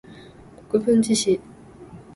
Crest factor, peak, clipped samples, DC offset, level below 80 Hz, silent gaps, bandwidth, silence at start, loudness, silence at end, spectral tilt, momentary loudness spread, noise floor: 16 dB; -8 dBFS; under 0.1%; under 0.1%; -56 dBFS; none; 11.5 kHz; 0.1 s; -21 LUFS; 0.15 s; -4.5 dB/octave; 7 LU; -45 dBFS